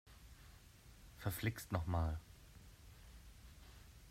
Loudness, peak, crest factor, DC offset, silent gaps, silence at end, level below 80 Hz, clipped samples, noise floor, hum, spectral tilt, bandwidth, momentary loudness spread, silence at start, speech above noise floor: -43 LUFS; -24 dBFS; 22 dB; under 0.1%; none; 0 s; -56 dBFS; under 0.1%; -62 dBFS; none; -6 dB/octave; 16 kHz; 21 LU; 0.05 s; 21 dB